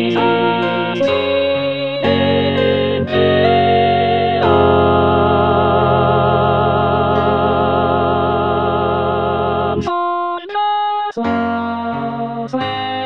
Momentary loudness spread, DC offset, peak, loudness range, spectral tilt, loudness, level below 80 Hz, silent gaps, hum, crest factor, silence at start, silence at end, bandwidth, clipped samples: 7 LU; 0.7%; 0 dBFS; 5 LU; -8 dB/octave; -15 LUFS; -40 dBFS; none; none; 14 dB; 0 s; 0 s; 6.8 kHz; under 0.1%